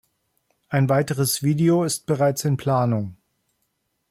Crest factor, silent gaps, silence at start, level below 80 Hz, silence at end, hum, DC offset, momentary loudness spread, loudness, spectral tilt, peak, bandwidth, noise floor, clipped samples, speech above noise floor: 14 dB; none; 0.7 s; -60 dBFS; 1 s; none; under 0.1%; 6 LU; -21 LUFS; -5.5 dB/octave; -8 dBFS; 16 kHz; -73 dBFS; under 0.1%; 53 dB